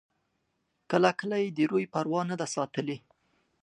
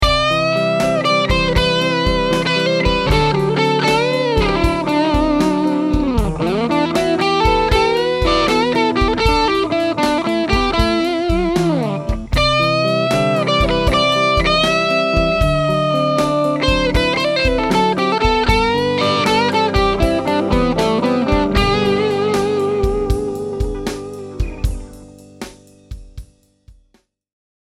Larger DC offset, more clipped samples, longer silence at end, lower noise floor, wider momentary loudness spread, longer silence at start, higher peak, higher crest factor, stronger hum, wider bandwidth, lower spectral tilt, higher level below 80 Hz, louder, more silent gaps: neither; neither; second, 0.65 s vs 1.05 s; first, -78 dBFS vs -59 dBFS; first, 9 LU vs 6 LU; first, 0.9 s vs 0 s; second, -8 dBFS vs 0 dBFS; first, 22 dB vs 16 dB; neither; second, 11 kHz vs 14.5 kHz; about the same, -5.5 dB/octave vs -5.5 dB/octave; second, -78 dBFS vs -26 dBFS; second, -29 LUFS vs -16 LUFS; neither